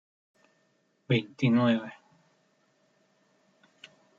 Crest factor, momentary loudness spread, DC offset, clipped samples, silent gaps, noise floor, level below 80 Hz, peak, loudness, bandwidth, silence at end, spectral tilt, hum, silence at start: 20 dB; 7 LU; under 0.1%; under 0.1%; none; -71 dBFS; -74 dBFS; -12 dBFS; -27 LUFS; 7.2 kHz; 2.25 s; -7.5 dB/octave; none; 1.1 s